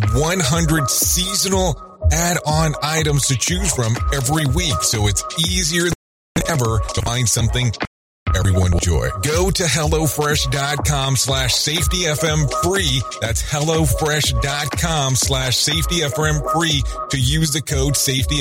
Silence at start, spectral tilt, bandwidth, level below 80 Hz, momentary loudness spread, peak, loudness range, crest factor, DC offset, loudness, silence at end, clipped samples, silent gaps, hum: 0 s; -3.5 dB/octave; 16.5 kHz; -28 dBFS; 4 LU; -4 dBFS; 2 LU; 14 dB; under 0.1%; -17 LUFS; 0 s; under 0.1%; 5.95-6.35 s, 7.87-8.26 s; none